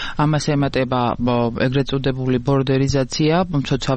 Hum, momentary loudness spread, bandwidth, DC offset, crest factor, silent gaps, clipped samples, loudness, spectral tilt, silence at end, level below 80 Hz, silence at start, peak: none; 3 LU; 8.6 kHz; under 0.1%; 12 dB; none; under 0.1%; -19 LUFS; -6.5 dB/octave; 0 s; -36 dBFS; 0 s; -8 dBFS